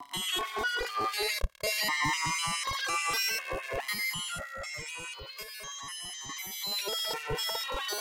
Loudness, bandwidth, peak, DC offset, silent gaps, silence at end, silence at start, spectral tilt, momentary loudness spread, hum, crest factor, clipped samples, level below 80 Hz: -32 LUFS; 16.5 kHz; -16 dBFS; under 0.1%; none; 0 s; 0 s; -1 dB/octave; 10 LU; none; 18 dB; under 0.1%; -48 dBFS